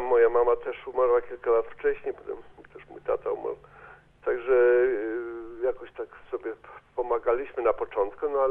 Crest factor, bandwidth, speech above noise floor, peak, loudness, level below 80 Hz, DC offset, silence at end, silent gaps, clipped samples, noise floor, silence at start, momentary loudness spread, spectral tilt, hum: 16 dB; 3.6 kHz; 25 dB; -10 dBFS; -27 LUFS; -56 dBFS; under 0.1%; 0 s; none; under 0.1%; -51 dBFS; 0 s; 17 LU; -8 dB/octave; none